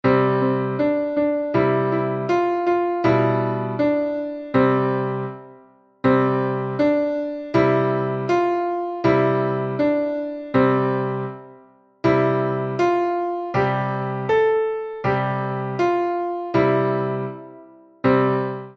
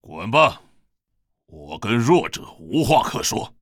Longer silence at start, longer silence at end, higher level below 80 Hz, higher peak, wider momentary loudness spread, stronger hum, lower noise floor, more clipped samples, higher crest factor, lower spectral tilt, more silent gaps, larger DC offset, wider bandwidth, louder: about the same, 0.05 s vs 0.05 s; about the same, 0.05 s vs 0.15 s; second, -56 dBFS vs -48 dBFS; second, -6 dBFS vs -2 dBFS; second, 7 LU vs 13 LU; neither; second, -51 dBFS vs -73 dBFS; neither; about the same, 16 dB vs 20 dB; first, -8.5 dB/octave vs -4.5 dB/octave; neither; neither; second, 6.8 kHz vs 18.5 kHz; about the same, -21 LUFS vs -20 LUFS